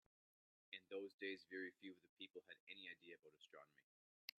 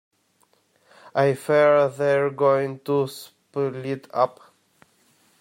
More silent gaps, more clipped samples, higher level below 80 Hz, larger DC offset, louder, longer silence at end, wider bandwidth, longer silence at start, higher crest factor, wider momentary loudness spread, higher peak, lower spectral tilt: first, 1.14-1.18 s, 2.09-2.17 s, 2.30-2.34 s, 2.60-2.67 s vs none; neither; second, under -90 dBFS vs -72 dBFS; neither; second, -56 LUFS vs -22 LUFS; second, 0.75 s vs 1.1 s; second, 8.8 kHz vs 16 kHz; second, 0.7 s vs 1.15 s; first, 26 dB vs 18 dB; about the same, 14 LU vs 12 LU; second, -32 dBFS vs -6 dBFS; second, -3.5 dB/octave vs -6.5 dB/octave